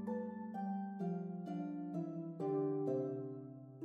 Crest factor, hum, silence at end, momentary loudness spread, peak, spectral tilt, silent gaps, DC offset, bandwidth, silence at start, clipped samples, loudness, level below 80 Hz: 14 dB; none; 0 s; 8 LU; -26 dBFS; -10.5 dB/octave; none; under 0.1%; 6.8 kHz; 0 s; under 0.1%; -42 LUFS; under -90 dBFS